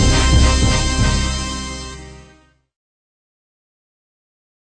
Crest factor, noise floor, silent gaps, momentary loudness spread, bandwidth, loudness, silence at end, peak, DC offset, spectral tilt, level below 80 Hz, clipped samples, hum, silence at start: 18 dB; -51 dBFS; none; 16 LU; 10 kHz; -17 LUFS; 2.55 s; 0 dBFS; under 0.1%; -4 dB/octave; -22 dBFS; under 0.1%; none; 0 s